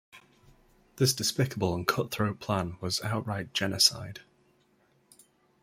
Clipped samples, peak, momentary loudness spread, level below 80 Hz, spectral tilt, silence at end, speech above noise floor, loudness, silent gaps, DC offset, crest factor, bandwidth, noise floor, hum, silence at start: under 0.1%; -8 dBFS; 9 LU; -62 dBFS; -3.5 dB/octave; 1.4 s; 38 dB; -28 LUFS; none; under 0.1%; 24 dB; 16 kHz; -67 dBFS; none; 0.15 s